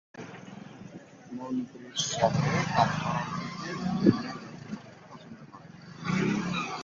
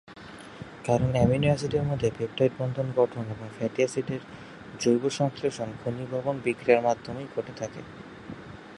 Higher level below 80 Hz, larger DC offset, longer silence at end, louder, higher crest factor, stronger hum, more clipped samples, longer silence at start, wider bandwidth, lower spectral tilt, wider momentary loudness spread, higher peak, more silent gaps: second, -58 dBFS vs -52 dBFS; neither; about the same, 0 s vs 0 s; about the same, -29 LUFS vs -28 LUFS; about the same, 26 dB vs 22 dB; neither; neither; about the same, 0.15 s vs 0.1 s; second, 7.8 kHz vs 11.5 kHz; second, -5 dB/octave vs -6.5 dB/octave; about the same, 22 LU vs 20 LU; about the same, -6 dBFS vs -6 dBFS; neither